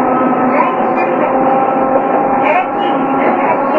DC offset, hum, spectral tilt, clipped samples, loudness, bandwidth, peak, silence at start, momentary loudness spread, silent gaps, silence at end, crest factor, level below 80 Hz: 0.2%; none; -8.5 dB/octave; under 0.1%; -12 LUFS; 5 kHz; 0 dBFS; 0 s; 2 LU; none; 0 s; 12 dB; -56 dBFS